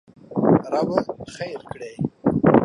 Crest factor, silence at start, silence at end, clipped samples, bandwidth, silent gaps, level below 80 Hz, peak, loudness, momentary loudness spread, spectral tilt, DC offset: 20 dB; 0.3 s; 0 s; under 0.1%; 11 kHz; none; -50 dBFS; 0 dBFS; -22 LUFS; 14 LU; -8.5 dB/octave; under 0.1%